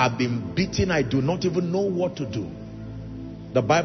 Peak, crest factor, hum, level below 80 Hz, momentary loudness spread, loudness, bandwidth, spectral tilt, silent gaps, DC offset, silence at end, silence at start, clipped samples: -6 dBFS; 18 dB; none; -46 dBFS; 14 LU; -25 LUFS; 6.4 kHz; -6 dB/octave; none; under 0.1%; 0 s; 0 s; under 0.1%